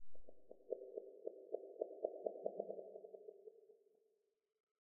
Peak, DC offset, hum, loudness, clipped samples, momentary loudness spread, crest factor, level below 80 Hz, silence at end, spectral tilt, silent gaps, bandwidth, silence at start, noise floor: -24 dBFS; under 0.1%; none; -50 LUFS; under 0.1%; 19 LU; 26 dB; -82 dBFS; 0.2 s; 2 dB/octave; 4.60-4.75 s; 1.2 kHz; 0 s; -84 dBFS